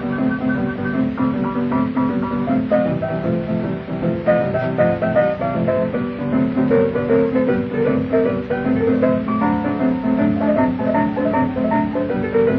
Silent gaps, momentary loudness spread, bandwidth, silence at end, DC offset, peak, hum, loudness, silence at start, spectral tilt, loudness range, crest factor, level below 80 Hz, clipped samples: none; 4 LU; 5.2 kHz; 0 s; under 0.1%; -4 dBFS; none; -19 LUFS; 0 s; -10.5 dB/octave; 2 LU; 14 dB; -44 dBFS; under 0.1%